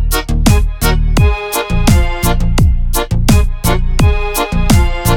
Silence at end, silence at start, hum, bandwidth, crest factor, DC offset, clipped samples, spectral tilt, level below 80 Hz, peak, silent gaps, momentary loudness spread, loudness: 0 s; 0 s; none; 18 kHz; 10 dB; under 0.1%; under 0.1%; -5 dB/octave; -14 dBFS; 0 dBFS; none; 4 LU; -13 LUFS